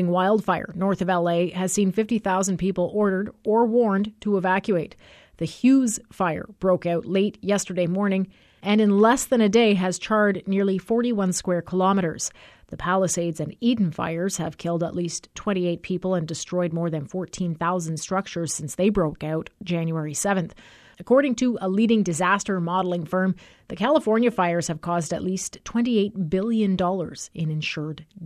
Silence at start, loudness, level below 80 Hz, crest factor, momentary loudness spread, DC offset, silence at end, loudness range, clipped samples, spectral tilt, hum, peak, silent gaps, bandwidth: 0 s; -23 LUFS; -54 dBFS; 16 dB; 9 LU; under 0.1%; 0 s; 5 LU; under 0.1%; -5.5 dB/octave; none; -6 dBFS; none; 13.5 kHz